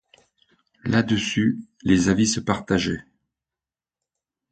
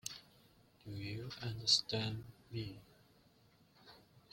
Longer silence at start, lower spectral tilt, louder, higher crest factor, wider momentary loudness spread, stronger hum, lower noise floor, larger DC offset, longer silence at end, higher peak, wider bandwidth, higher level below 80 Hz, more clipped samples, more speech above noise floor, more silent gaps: first, 0.85 s vs 0.05 s; first, -4.5 dB/octave vs -3 dB/octave; first, -22 LUFS vs -38 LUFS; second, 20 dB vs 28 dB; second, 9 LU vs 21 LU; neither; first, under -90 dBFS vs -69 dBFS; neither; first, 1.5 s vs 0.15 s; first, -4 dBFS vs -16 dBFS; second, 9.2 kHz vs 16.5 kHz; first, -48 dBFS vs -70 dBFS; neither; first, over 69 dB vs 30 dB; neither